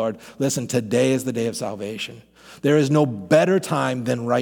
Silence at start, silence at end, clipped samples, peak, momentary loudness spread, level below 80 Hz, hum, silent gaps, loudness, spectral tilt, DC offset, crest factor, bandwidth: 0 s; 0 s; under 0.1%; -4 dBFS; 11 LU; -64 dBFS; none; none; -21 LUFS; -5.5 dB/octave; under 0.1%; 18 dB; 19 kHz